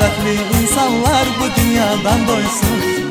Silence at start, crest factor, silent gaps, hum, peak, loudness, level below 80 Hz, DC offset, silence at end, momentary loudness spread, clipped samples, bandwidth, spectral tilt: 0 s; 14 dB; none; none; 0 dBFS; -15 LUFS; -26 dBFS; under 0.1%; 0 s; 2 LU; under 0.1%; 16 kHz; -4 dB/octave